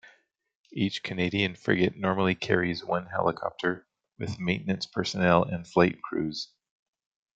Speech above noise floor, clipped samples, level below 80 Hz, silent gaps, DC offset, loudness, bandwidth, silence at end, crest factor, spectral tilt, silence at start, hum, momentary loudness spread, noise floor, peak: 35 dB; under 0.1%; -62 dBFS; none; under 0.1%; -28 LUFS; 8 kHz; 0.95 s; 24 dB; -6 dB/octave; 0.75 s; none; 9 LU; -62 dBFS; -6 dBFS